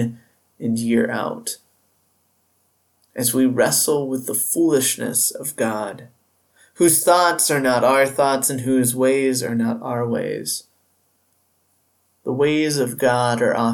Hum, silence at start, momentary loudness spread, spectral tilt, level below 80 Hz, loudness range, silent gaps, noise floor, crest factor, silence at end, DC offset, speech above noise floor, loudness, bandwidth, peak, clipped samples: none; 0 s; 12 LU; -3.5 dB/octave; -66 dBFS; 7 LU; none; -65 dBFS; 18 dB; 0 s; under 0.1%; 46 dB; -19 LUFS; 19 kHz; -4 dBFS; under 0.1%